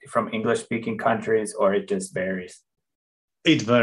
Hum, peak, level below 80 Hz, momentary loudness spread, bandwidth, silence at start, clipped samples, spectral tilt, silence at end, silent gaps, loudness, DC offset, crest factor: none; -6 dBFS; -68 dBFS; 7 LU; 12 kHz; 0.05 s; under 0.1%; -5 dB/octave; 0 s; 2.95-3.28 s; -24 LUFS; under 0.1%; 18 dB